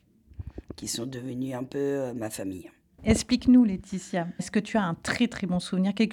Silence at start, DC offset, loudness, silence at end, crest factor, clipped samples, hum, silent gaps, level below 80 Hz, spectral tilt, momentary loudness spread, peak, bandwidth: 0.4 s; under 0.1%; -27 LUFS; 0 s; 20 dB; under 0.1%; none; none; -48 dBFS; -5.5 dB/octave; 17 LU; -8 dBFS; 13.5 kHz